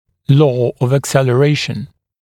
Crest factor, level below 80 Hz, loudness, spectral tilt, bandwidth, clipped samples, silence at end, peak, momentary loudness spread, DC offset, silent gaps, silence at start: 14 dB; -52 dBFS; -14 LUFS; -6.5 dB/octave; 16 kHz; under 0.1%; 0.35 s; 0 dBFS; 11 LU; under 0.1%; none; 0.3 s